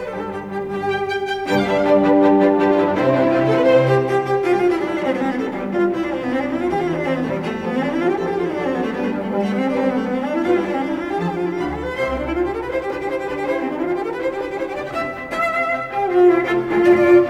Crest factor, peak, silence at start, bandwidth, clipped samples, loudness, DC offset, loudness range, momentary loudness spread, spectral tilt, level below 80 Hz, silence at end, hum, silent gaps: 16 dB; -4 dBFS; 0 s; 10 kHz; under 0.1%; -19 LUFS; under 0.1%; 7 LU; 10 LU; -7 dB/octave; -46 dBFS; 0 s; none; none